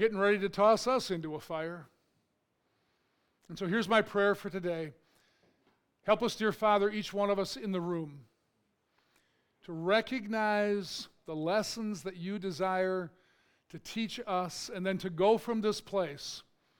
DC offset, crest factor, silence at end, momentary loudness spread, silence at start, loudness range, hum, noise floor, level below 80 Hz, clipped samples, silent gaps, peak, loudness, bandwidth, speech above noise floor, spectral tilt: under 0.1%; 22 dB; 0.4 s; 14 LU; 0 s; 3 LU; none; -78 dBFS; -68 dBFS; under 0.1%; none; -12 dBFS; -32 LUFS; 19 kHz; 46 dB; -5 dB/octave